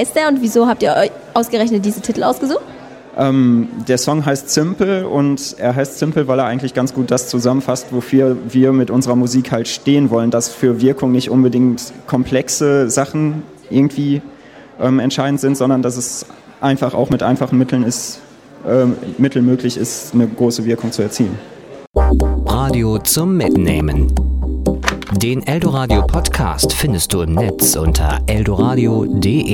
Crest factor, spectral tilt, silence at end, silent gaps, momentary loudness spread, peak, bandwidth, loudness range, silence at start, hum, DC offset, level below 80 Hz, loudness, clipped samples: 14 dB; -5.5 dB/octave; 0 s; 21.87-21.92 s; 6 LU; 0 dBFS; 17 kHz; 2 LU; 0 s; none; under 0.1%; -26 dBFS; -15 LUFS; under 0.1%